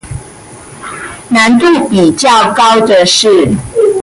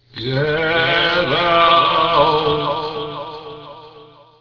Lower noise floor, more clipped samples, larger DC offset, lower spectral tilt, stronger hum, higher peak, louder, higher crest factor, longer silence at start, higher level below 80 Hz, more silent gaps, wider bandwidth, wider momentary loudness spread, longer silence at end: second, -31 dBFS vs -44 dBFS; neither; neither; second, -4 dB/octave vs -6 dB/octave; neither; about the same, 0 dBFS vs -2 dBFS; first, -7 LUFS vs -15 LUFS; second, 8 dB vs 16 dB; about the same, 0.05 s vs 0.15 s; first, -38 dBFS vs -46 dBFS; neither; first, 11.5 kHz vs 5.4 kHz; about the same, 18 LU vs 18 LU; second, 0 s vs 0.35 s